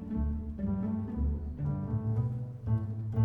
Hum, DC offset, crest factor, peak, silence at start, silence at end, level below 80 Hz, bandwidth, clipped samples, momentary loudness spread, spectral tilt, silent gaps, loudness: none; under 0.1%; 14 dB; -18 dBFS; 0 s; 0 s; -40 dBFS; 2.8 kHz; under 0.1%; 3 LU; -12 dB/octave; none; -34 LUFS